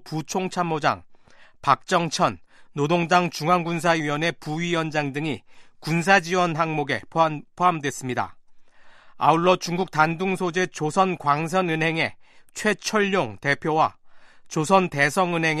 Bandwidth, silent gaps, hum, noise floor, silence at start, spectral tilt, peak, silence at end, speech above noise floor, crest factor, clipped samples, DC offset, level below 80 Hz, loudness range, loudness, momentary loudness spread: 13.5 kHz; none; none; -49 dBFS; 0 s; -5 dB/octave; -2 dBFS; 0 s; 26 dB; 20 dB; under 0.1%; under 0.1%; -60 dBFS; 1 LU; -23 LUFS; 9 LU